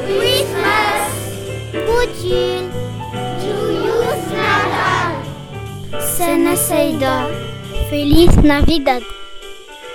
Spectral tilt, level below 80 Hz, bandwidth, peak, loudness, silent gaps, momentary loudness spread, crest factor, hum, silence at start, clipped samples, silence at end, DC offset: -4.5 dB/octave; -26 dBFS; 18.5 kHz; 0 dBFS; -16 LUFS; none; 15 LU; 16 dB; none; 0 s; under 0.1%; 0 s; under 0.1%